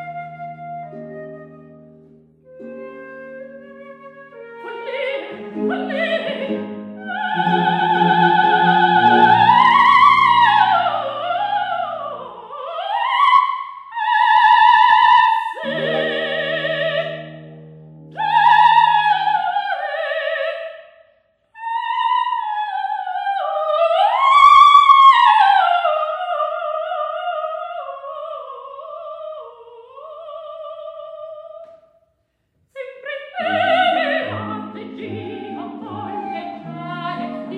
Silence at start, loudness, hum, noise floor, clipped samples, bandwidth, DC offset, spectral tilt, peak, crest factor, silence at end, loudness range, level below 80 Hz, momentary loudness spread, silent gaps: 0 s; -15 LUFS; none; -67 dBFS; under 0.1%; 9.6 kHz; under 0.1%; -5 dB/octave; 0 dBFS; 18 dB; 0 s; 22 LU; -62 dBFS; 23 LU; none